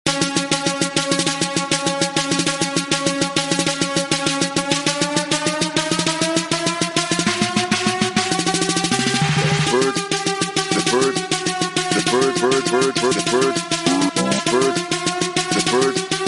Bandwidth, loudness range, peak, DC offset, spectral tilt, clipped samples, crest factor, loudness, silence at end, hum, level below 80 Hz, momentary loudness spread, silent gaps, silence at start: 11.5 kHz; 1 LU; -2 dBFS; under 0.1%; -3 dB/octave; under 0.1%; 18 dB; -18 LUFS; 0 s; none; -54 dBFS; 3 LU; none; 0.05 s